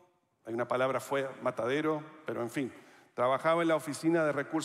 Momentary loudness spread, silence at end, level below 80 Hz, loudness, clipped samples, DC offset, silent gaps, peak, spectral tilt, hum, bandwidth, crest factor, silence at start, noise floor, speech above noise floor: 12 LU; 0 s; -82 dBFS; -32 LUFS; under 0.1%; under 0.1%; none; -16 dBFS; -5.5 dB/octave; none; 15 kHz; 16 dB; 0.45 s; -51 dBFS; 20 dB